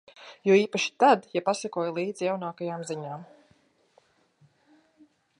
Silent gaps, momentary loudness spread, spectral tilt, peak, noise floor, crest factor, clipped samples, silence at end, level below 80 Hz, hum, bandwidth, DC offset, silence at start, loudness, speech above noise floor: none; 14 LU; -4.5 dB/octave; -6 dBFS; -65 dBFS; 22 dB; under 0.1%; 2.15 s; -82 dBFS; none; 11 kHz; under 0.1%; 0.2 s; -26 LUFS; 39 dB